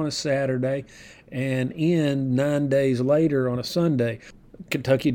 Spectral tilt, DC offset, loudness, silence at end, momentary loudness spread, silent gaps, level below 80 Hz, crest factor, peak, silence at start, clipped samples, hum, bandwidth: -6.5 dB/octave; under 0.1%; -23 LUFS; 0 s; 10 LU; none; -56 dBFS; 16 dB; -8 dBFS; 0 s; under 0.1%; none; 18 kHz